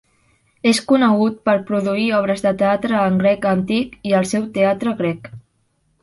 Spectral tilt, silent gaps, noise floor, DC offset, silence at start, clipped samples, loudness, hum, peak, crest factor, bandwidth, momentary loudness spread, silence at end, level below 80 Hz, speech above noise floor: -5.5 dB/octave; none; -64 dBFS; under 0.1%; 0.65 s; under 0.1%; -18 LUFS; none; -2 dBFS; 16 dB; 11.5 kHz; 6 LU; 0.65 s; -54 dBFS; 47 dB